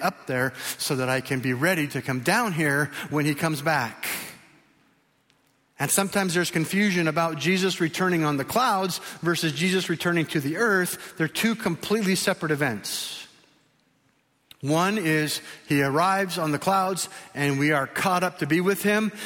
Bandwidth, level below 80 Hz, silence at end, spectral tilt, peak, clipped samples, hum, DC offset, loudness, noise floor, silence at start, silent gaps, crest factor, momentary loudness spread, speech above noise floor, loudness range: 17 kHz; -64 dBFS; 0 s; -4.5 dB/octave; -8 dBFS; under 0.1%; none; under 0.1%; -24 LUFS; -67 dBFS; 0 s; none; 18 dB; 6 LU; 42 dB; 4 LU